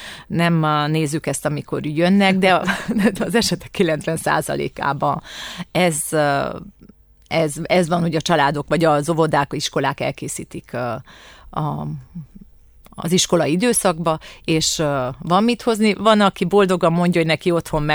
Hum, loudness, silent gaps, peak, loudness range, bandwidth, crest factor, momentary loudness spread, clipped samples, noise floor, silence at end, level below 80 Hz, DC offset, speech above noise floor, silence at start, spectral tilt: none; -19 LUFS; none; -2 dBFS; 6 LU; over 20 kHz; 18 dB; 11 LU; under 0.1%; -48 dBFS; 0 s; -46 dBFS; under 0.1%; 29 dB; 0 s; -4.5 dB/octave